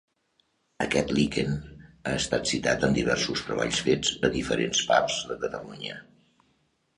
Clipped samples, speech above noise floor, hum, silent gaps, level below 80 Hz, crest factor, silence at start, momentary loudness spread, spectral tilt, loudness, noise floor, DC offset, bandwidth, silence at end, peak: under 0.1%; 44 dB; none; none; -50 dBFS; 22 dB; 0.8 s; 12 LU; -3.5 dB/octave; -26 LUFS; -71 dBFS; under 0.1%; 11.5 kHz; 0.95 s; -6 dBFS